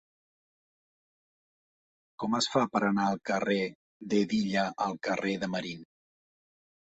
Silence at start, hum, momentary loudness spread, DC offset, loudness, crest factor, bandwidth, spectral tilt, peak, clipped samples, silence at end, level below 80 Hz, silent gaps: 2.2 s; none; 10 LU; under 0.1%; -30 LUFS; 22 dB; 8.2 kHz; -5 dB/octave; -12 dBFS; under 0.1%; 1.1 s; -70 dBFS; 3.75-4.00 s